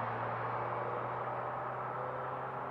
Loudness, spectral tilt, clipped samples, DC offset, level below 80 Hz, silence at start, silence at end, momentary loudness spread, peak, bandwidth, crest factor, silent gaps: -38 LUFS; -8.5 dB/octave; under 0.1%; under 0.1%; -70 dBFS; 0 s; 0 s; 2 LU; -26 dBFS; 6 kHz; 12 dB; none